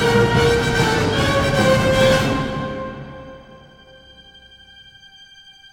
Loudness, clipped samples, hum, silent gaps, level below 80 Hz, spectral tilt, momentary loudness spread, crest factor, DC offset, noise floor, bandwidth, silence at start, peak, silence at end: -17 LUFS; under 0.1%; none; none; -36 dBFS; -5 dB/octave; 19 LU; 16 dB; under 0.1%; -45 dBFS; 18.5 kHz; 0 s; -2 dBFS; 2.3 s